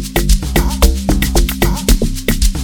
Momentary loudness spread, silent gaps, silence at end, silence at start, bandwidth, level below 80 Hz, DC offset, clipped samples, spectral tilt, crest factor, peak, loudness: 2 LU; none; 0 s; 0 s; 19.5 kHz; -14 dBFS; under 0.1%; under 0.1%; -4.5 dB/octave; 12 dB; 0 dBFS; -15 LUFS